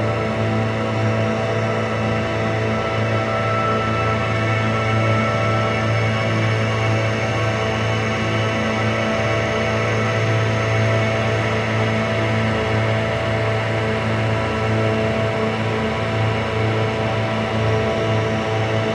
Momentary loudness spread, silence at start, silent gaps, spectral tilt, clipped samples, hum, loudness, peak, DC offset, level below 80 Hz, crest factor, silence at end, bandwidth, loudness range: 2 LU; 0 s; none; -6 dB/octave; under 0.1%; none; -20 LUFS; -8 dBFS; under 0.1%; -40 dBFS; 12 dB; 0 s; 9.4 kHz; 1 LU